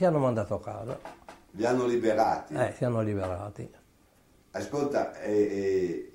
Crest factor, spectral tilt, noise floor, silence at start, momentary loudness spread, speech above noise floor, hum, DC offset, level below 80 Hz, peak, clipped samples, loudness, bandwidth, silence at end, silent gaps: 18 dB; -7 dB/octave; -62 dBFS; 0 s; 15 LU; 34 dB; none; under 0.1%; -62 dBFS; -10 dBFS; under 0.1%; -29 LUFS; 16 kHz; 0.05 s; none